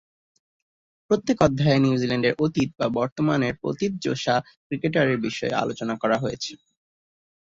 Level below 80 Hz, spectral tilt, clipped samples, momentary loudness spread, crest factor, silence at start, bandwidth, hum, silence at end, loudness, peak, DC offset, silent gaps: -54 dBFS; -6 dB/octave; under 0.1%; 7 LU; 20 dB; 1.1 s; 7.8 kHz; none; 0.9 s; -24 LUFS; -6 dBFS; under 0.1%; 3.12-3.16 s, 4.57-4.70 s